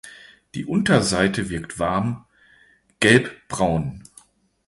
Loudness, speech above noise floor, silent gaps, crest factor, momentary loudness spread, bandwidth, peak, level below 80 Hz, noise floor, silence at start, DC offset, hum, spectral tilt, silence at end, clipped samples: -21 LUFS; 36 dB; none; 22 dB; 18 LU; 11.5 kHz; -2 dBFS; -46 dBFS; -57 dBFS; 0.05 s; under 0.1%; none; -5 dB/octave; 0.65 s; under 0.1%